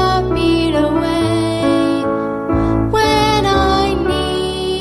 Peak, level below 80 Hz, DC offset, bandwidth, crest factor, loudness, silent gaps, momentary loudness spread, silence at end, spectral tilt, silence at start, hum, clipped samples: -2 dBFS; -28 dBFS; under 0.1%; 13.5 kHz; 12 dB; -15 LUFS; none; 5 LU; 0 s; -5.5 dB/octave; 0 s; none; under 0.1%